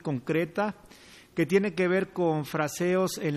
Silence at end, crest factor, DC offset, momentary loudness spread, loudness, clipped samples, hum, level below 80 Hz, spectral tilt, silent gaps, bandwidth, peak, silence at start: 0 s; 18 dB; under 0.1%; 7 LU; -28 LUFS; under 0.1%; none; -66 dBFS; -6 dB/octave; none; 15.5 kHz; -10 dBFS; 0.05 s